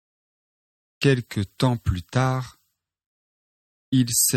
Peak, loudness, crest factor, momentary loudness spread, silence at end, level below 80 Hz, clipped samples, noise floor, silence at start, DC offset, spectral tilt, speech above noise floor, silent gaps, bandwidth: -6 dBFS; -23 LUFS; 20 dB; 9 LU; 0 s; -44 dBFS; under 0.1%; under -90 dBFS; 1 s; under 0.1%; -4.5 dB/octave; over 68 dB; 3.06-3.92 s; 15.5 kHz